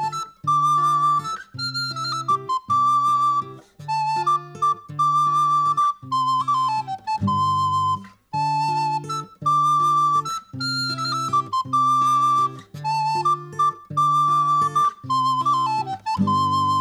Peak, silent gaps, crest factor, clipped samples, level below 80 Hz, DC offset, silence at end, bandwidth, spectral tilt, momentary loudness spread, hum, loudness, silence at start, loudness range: -10 dBFS; none; 12 dB; under 0.1%; -66 dBFS; under 0.1%; 0 s; 14 kHz; -4 dB/octave; 9 LU; none; -21 LUFS; 0 s; 2 LU